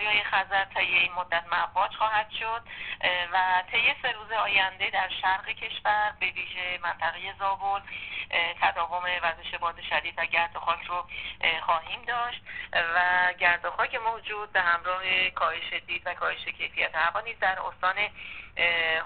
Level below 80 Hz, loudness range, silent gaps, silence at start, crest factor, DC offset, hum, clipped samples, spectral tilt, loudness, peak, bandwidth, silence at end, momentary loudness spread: -58 dBFS; 3 LU; none; 0 s; 20 dB; 0.2%; none; under 0.1%; 2 dB/octave; -27 LUFS; -8 dBFS; 4.6 kHz; 0 s; 8 LU